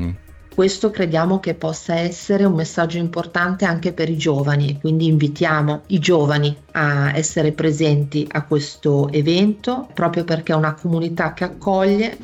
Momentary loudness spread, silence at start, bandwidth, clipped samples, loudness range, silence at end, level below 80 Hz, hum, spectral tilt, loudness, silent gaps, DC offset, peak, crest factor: 5 LU; 0 s; 8.2 kHz; under 0.1%; 2 LU; 0 s; -48 dBFS; none; -6 dB/octave; -19 LUFS; none; under 0.1%; -6 dBFS; 12 dB